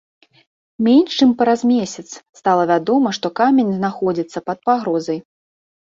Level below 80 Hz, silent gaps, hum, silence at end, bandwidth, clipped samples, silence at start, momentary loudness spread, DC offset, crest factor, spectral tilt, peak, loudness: -62 dBFS; 2.29-2.33 s; none; 0.65 s; 7.6 kHz; under 0.1%; 0.8 s; 11 LU; under 0.1%; 14 dB; -5.5 dB/octave; -2 dBFS; -17 LUFS